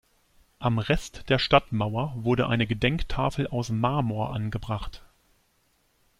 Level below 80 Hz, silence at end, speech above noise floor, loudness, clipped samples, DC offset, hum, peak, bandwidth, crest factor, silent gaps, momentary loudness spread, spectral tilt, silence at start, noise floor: -42 dBFS; 1.2 s; 42 dB; -26 LUFS; under 0.1%; under 0.1%; none; -4 dBFS; 12.5 kHz; 24 dB; none; 9 LU; -6.5 dB/octave; 0.6 s; -68 dBFS